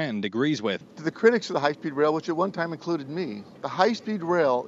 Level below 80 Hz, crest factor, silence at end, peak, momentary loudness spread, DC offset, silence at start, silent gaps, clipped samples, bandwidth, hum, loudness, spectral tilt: -74 dBFS; 20 dB; 0 s; -6 dBFS; 10 LU; under 0.1%; 0 s; none; under 0.1%; 7.8 kHz; none; -26 LUFS; -6 dB/octave